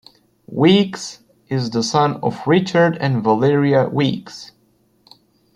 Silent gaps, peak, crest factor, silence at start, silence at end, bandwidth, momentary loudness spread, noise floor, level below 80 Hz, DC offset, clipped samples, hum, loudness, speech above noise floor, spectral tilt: none; 0 dBFS; 18 dB; 0.5 s; 1.1 s; 11 kHz; 16 LU; -59 dBFS; -58 dBFS; under 0.1%; under 0.1%; none; -17 LUFS; 43 dB; -6 dB/octave